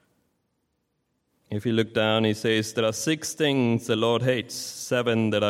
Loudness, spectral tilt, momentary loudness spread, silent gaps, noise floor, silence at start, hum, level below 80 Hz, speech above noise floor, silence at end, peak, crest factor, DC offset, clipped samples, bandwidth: -25 LUFS; -4.5 dB/octave; 6 LU; none; -75 dBFS; 1.5 s; none; -68 dBFS; 51 dB; 0 s; -8 dBFS; 18 dB; under 0.1%; under 0.1%; 16.5 kHz